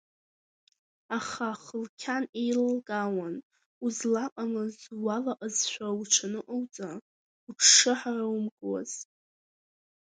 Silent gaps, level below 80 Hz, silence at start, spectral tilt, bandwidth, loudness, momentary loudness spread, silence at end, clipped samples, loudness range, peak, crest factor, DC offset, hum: 1.89-1.98 s, 2.29-2.33 s, 3.43-3.50 s, 3.66-3.81 s, 4.32-4.36 s, 7.02-7.47 s, 8.52-8.57 s; -80 dBFS; 1.1 s; -1.5 dB/octave; 10 kHz; -28 LUFS; 17 LU; 1.05 s; under 0.1%; 7 LU; -6 dBFS; 24 dB; under 0.1%; none